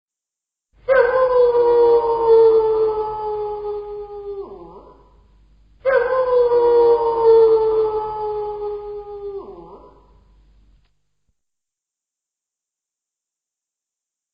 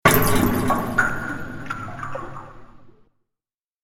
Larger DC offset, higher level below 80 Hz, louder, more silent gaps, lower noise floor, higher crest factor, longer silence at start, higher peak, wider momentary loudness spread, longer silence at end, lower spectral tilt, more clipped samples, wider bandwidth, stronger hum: neither; second, -50 dBFS vs -36 dBFS; first, -16 LUFS vs -23 LUFS; neither; about the same, -87 dBFS vs -88 dBFS; second, 16 dB vs 22 dB; first, 0.9 s vs 0.05 s; second, -4 dBFS vs 0 dBFS; first, 19 LU vs 15 LU; first, 4.6 s vs 0.95 s; first, -8 dB/octave vs -4.5 dB/octave; neither; second, 5.2 kHz vs 17 kHz; neither